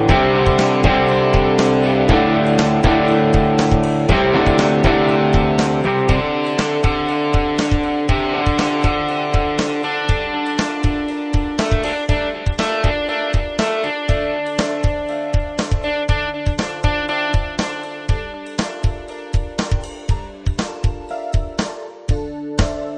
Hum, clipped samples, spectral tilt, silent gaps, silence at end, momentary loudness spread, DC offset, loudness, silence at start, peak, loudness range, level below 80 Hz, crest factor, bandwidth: none; under 0.1%; -6 dB/octave; none; 0 s; 9 LU; under 0.1%; -18 LUFS; 0 s; 0 dBFS; 9 LU; -24 dBFS; 18 dB; 10 kHz